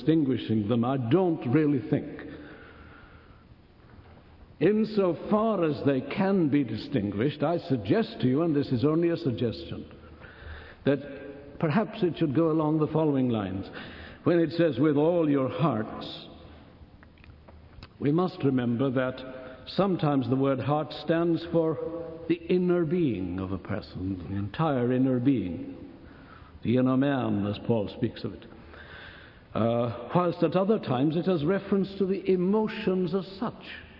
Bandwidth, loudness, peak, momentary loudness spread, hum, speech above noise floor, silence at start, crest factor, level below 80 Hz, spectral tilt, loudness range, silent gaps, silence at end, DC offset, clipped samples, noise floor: 5.8 kHz; -27 LUFS; -10 dBFS; 17 LU; none; 28 dB; 0 s; 18 dB; -58 dBFS; -10.5 dB/octave; 4 LU; none; 0 s; under 0.1%; under 0.1%; -54 dBFS